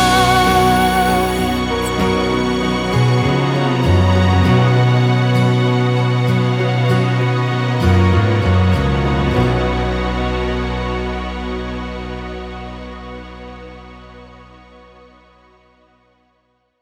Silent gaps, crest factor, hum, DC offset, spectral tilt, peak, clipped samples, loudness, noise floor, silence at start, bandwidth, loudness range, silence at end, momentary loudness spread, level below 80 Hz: none; 14 dB; 60 Hz at -40 dBFS; under 0.1%; -6.5 dB/octave; -2 dBFS; under 0.1%; -16 LUFS; -63 dBFS; 0 s; 18.5 kHz; 16 LU; 2.4 s; 16 LU; -30 dBFS